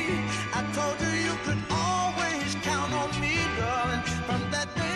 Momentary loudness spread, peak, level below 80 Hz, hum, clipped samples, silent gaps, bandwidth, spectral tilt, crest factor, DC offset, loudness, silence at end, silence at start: 3 LU; -16 dBFS; -46 dBFS; none; under 0.1%; none; 13 kHz; -4 dB/octave; 12 dB; under 0.1%; -28 LUFS; 0 s; 0 s